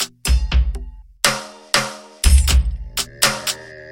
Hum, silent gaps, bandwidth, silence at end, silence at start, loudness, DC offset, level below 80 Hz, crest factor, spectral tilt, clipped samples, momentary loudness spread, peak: none; none; 17 kHz; 0 s; 0 s; -19 LUFS; under 0.1%; -20 dBFS; 18 dB; -2.5 dB/octave; under 0.1%; 13 LU; 0 dBFS